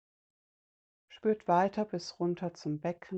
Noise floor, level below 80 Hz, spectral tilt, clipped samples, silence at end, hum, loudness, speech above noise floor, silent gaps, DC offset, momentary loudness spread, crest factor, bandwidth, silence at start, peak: under -90 dBFS; -74 dBFS; -6.5 dB/octave; under 0.1%; 0 s; none; -33 LUFS; over 58 dB; none; under 0.1%; 9 LU; 20 dB; 8.2 kHz; 1.1 s; -14 dBFS